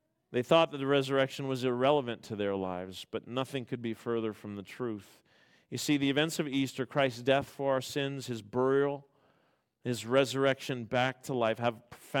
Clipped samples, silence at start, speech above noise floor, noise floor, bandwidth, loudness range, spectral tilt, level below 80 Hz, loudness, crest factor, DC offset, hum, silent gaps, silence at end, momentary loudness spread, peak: under 0.1%; 0.3 s; 42 dB; -73 dBFS; 17.5 kHz; 6 LU; -5 dB/octave; -72 dBFS; -31 LUFS; 22 dB; under 0.1%; none; none; 0 s; 11 LU; -10 dBFS